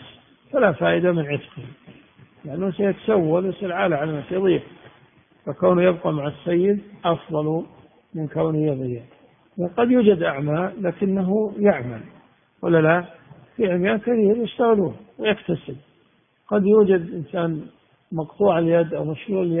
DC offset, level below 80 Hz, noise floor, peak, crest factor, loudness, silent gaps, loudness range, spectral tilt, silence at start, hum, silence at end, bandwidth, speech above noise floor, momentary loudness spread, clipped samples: under 0.1%; -58 dBFS; -61 dBFS; -2 dBFS; 20 dB; -21 LUFS; none; 3 LU; -12 dB/octave; 0 s; none; 0 s; 3.7 kHz; 41 dB; 15 LU; under 0.1%